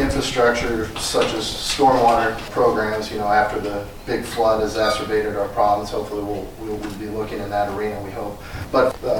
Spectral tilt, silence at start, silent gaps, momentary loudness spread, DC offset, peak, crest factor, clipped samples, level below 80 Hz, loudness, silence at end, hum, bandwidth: -4 dB/octave; 0 s; none; 11 LU; under 0.1%; -6 dBFS; 16 dB; under 0.1%; -38 dBFS; -21 LUFS; 0 s; none; 19 kHz